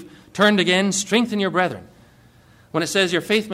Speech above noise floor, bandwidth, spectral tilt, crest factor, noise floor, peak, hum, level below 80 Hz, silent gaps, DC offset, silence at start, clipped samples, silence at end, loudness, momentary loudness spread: 32 dB; 16 kHz; -3.5 dB/octave; 16 dB; -51 dBFS; -6 dBFS; none; -60 dBFS; none; under 0.1%; 0 s; under 0.1%; 0 s; -19 LUFS; 10 LU